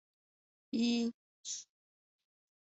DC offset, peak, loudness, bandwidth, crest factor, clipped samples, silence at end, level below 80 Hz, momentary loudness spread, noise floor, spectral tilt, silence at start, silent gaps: under 0.1%; -24 dBFS; -37 LUFS; 8 kHz; 18 dB; under 0.1%; 1.1 s; -82 dBFS; 11 LU; under -90 dBFS; -3.5 dB/octave; 0.75 s; 1.14-1.44 s